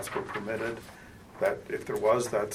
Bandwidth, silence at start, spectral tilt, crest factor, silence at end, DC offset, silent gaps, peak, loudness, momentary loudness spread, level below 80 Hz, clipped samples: 16 kHz; 0 s; -4.5 dB/octave; 18 dB; 0 s; under 0.1%; none; -12 dBFS; -31 LUFS; 21 LU; -60 dBFS; under 0.1%